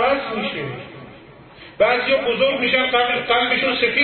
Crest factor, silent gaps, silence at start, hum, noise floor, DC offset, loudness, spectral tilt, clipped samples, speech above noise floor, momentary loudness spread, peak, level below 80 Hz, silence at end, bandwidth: 16 dB; none; 0 s; none; -43 dBFS; under 0.1%; -18 LUFS; -9 dB/octave; under 0.1%; 25 dB; 12 LU; -4 dBFS; -52 dBFS; 0 s; 4.5 kHz